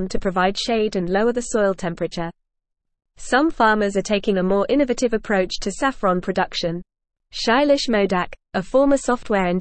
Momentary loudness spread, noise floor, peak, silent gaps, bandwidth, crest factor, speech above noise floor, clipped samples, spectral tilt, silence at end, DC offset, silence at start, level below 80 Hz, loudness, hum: 9 LU; -78 dBFS; -4 dBFS; none; 8.8 kHz; 16 dB; 58 dB; under 0.1%; -5 dB/octave; 0 s; 0.3%; 0 s; -42 dBFS; -20 LUFS; none